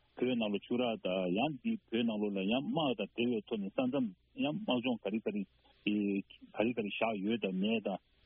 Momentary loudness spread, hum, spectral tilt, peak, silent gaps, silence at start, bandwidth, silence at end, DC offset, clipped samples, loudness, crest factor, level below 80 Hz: 5 LU; none; -4.5 dB/octave; -18 dBFS; none; 0.15 s; 3.8 kHz; 0.3 s; under 0.1%; under 0.1%; -35 LUFS; 18 dB; -72 dBFS